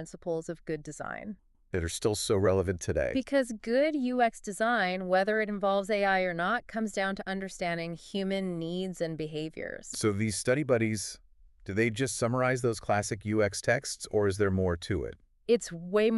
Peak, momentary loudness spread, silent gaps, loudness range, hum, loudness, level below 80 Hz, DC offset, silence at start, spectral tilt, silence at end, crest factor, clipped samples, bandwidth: -12 dBFS; 10 LU; none; 4 LU; none; -30 LUFS; -56 dBFS; under 0.1%; 0 s; -5 dB/octave; 0 s; 18 dB; under 0.1%; 12 kHz